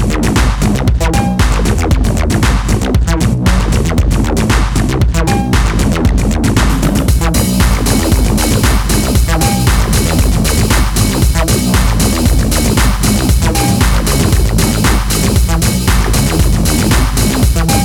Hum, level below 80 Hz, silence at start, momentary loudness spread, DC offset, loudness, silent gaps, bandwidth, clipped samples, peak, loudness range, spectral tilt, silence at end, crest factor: none; -14 dBFS; 0 s; 2 LU; under 0.1%; -12 LUFS; none; 19 kHz; under 0.1%; 0 dBFS; 1 LU; -5 dB/octave; 0 s; 10 dB